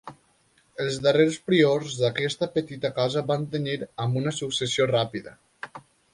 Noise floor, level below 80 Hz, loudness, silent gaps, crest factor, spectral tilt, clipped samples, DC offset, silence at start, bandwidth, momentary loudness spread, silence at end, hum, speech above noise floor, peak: -64 dBFS; -62 dBFS; -25 LUFS; none; 20 dB; -5 dB/octave; under 0.1%; under 0.1%; 0.05 s; 11.5 kHz; 16 LU; 0.35 s; none; 39 dB; -6 dBFS